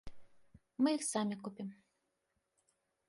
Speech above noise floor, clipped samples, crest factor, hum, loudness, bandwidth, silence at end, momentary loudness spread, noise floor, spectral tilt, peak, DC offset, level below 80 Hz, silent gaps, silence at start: 48 dB; under 0.1%; 20 dB; none; -37 LUFS; 11.5 kHz; 1.35 s; 15 LU; -84 dBFS; -4 dB/octave; -22 dBFS; under 0.1%; -68 dBFS; none; 0.05 s